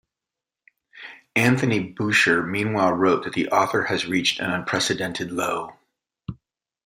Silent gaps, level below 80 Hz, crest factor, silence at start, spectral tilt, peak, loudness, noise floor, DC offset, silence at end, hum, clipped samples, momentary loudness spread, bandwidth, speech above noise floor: none; -60 dBFS; 20 dB; 0.95 s; -4.5 dB/octave; -4 dBFS; -22 LUFS; -88 dBFS; under 0.1%; 0.5 s; none; under 0.1%; 20 LU; 16 kHz; 66 dB